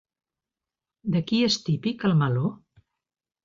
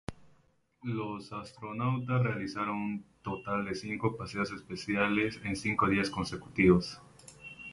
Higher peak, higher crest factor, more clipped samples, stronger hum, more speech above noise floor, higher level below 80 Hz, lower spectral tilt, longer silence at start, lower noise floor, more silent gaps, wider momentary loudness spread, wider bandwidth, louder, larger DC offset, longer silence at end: about the same, -12 dBFS vs -10 dBFS; second, 16 dB vs 22 dB; neither; neither; first, 66 dB vs 36 dB; second, -64 dBFS vs -56 dBFS; about the same, -6 dB/octave vs -6.5 dB/octave; first, 1.05 s vs 0.1 s; first, -90 dBFS vs -68 dBFS; neither; second, 6 LU vs 15 LU; second, 7.6 kHz vs 11.5 kHz; first, -25 LUFS vs -32 LUFS; neither; first, 0.9 s vs 0 s